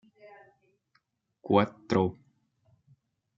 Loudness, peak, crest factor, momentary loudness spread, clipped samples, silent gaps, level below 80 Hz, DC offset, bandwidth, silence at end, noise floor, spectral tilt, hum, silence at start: -28 LUFS; -8 dBFS; 26 dB; 8 LU; under 0.1%; none; -70 dBFS; under 0.1%; 7.4 kHz; 1.25 s; -74 dBFS; -7.5 dB/octave; none; 1.45 s